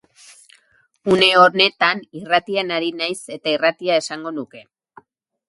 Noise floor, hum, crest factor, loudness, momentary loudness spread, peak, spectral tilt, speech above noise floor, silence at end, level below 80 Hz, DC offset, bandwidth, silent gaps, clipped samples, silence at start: -59 dBFS; none; 20 dB; -17 LUFS; 16 LU; 0 dBFS; -3.5 dB/octave; 41 dB; 0.9 s; -62 dBFS; under 0.1%; 11.5 kHz; none; under 0.1%; 1.05 s